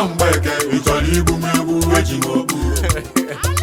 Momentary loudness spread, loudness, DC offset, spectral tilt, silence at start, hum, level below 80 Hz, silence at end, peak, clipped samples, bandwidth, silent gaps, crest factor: 4 LU; -17 LUFS; under 0.1%; -4.5 dB/octave; 0 s; none; -26 dBFS; 0 s; 0 dBFS; under 0.1%; 18 kHz; none; 16 dB